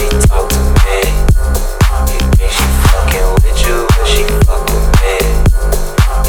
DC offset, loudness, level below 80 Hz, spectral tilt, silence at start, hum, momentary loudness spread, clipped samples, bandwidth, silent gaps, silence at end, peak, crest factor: under 0.1%; -12 LUFS; -10 dBFS; -5 dB/octave; 0 s; none; 3 LU; 0.3%; 20 kHz; none; 0 s; 0 dBFS; 8 dB